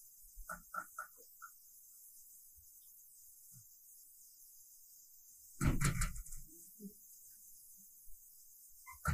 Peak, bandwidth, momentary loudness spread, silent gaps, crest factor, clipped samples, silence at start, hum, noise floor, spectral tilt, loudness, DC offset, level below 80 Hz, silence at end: -20 dBFS; 15.5 kHz; 19 LU; none; 26 dB; under 0.1%; 0 s; none; -61 dBFS; -4.5 dB/octave; -46 LUFS; under 0.1%; -50 dBFS; 0 s